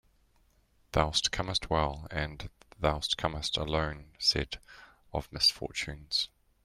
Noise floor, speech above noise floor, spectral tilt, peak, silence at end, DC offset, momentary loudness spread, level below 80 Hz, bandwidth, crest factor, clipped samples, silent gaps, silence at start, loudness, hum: -67 dBFS; 35 dB; -3.5 dB/octave; -10 dBFS; 0.4 s; under 0.1%; 13 LU; -46 dBFS; 16 kHz; 24 dB; under 0.1%; none; 0.95 s; -31 LUFS; none